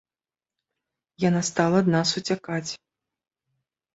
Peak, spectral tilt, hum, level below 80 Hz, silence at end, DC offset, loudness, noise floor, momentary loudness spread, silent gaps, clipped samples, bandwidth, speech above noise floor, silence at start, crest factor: -4 dBFS; -5 dB/octave; none; -64 dBFS; 1.2 s; under 0.1%; -24 LUFS; under -90 dBFS; 11 LU; none; under 0.1%; 8.2 kHz; over 67 dB; 1.2 s; 22 dB